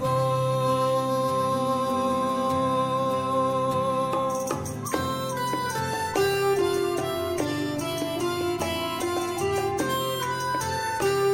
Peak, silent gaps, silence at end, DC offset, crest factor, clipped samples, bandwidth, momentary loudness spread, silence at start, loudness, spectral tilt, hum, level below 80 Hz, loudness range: -12 dBFS; none; 0 s; under 0.1%; 14 dB; under 0.1%; 17 kHz; 4 LU; 0 s; -26 LUFS; -5 dB/octave; none; -56 dBFS; 2 LU